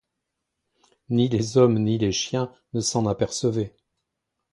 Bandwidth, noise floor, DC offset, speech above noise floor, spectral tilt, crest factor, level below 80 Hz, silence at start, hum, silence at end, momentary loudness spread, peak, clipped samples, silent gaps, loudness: 11.5 kHz; -81 dBFS; under 0.1%; 58 dB; -5.5 dB/octave; 20 dB; -54 dBFS; 1.1 s; none; 0.85 s; 10 LU; -6 dBFS; under 0.1%; none; -23 LUFS